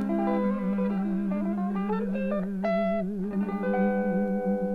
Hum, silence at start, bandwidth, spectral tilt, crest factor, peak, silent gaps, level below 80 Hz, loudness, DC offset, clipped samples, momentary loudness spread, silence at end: none; 0 s; 5 kHz; -10 dB/octave; 12 dB; -16 dBFS; none; -52 dBFS; -28 LUFS; under 0.1%; under 0.1%; 4 LU; 0 s